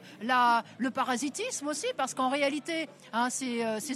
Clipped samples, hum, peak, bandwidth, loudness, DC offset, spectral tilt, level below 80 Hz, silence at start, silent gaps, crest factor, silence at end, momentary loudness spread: under 0.1%; none; -14 dBFS; 14 kHz; -30 LUFS; under 0.1%; -2.5 dB/octave; -86 dBFS; 0 s; none; 18 dB; 0 s; 8 LU